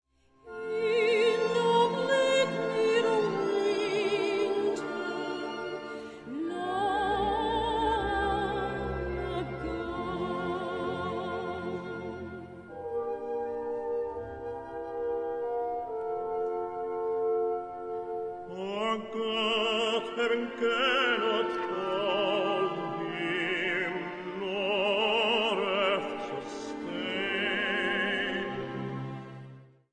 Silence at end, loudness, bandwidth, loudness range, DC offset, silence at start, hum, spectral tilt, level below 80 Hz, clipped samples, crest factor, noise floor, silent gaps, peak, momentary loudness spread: 0.25 s; -30 LUFS; 10 kHz; 8 LU; under 0.1%; 0.45 s; none; -4.5 dB/octave; -54 dBFS; under 0.1%; 18 dB; -52 dBFS; none; -14 dBFS; 12 LU